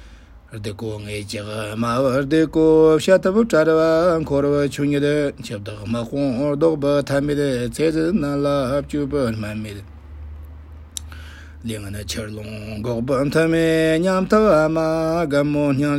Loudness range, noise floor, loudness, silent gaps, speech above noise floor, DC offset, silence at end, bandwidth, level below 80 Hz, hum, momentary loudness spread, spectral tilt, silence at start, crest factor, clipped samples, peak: 12 LU; -43 dBFS; -19 LUFS; none; 24 dB; under 0.1%; 0 s; 16 kHz; -42 dBFS; none; 17 LU; -6.5 dB/octave; 0 s; 16 dB; under 0.1%; -2 dBFS